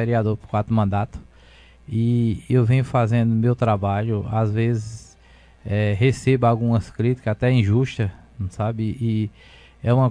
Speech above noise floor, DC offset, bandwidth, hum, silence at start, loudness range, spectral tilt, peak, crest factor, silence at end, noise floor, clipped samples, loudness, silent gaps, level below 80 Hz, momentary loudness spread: 30 dB; under 0.1%; 10 kHz; none; 0 s; 2 LU; -8.5 dB/octave; -6 dBFS; 16 dB; 0 s; -50 dBFS; under 0.1%; -21 LUFS; none; -46 dBFS; 10 LU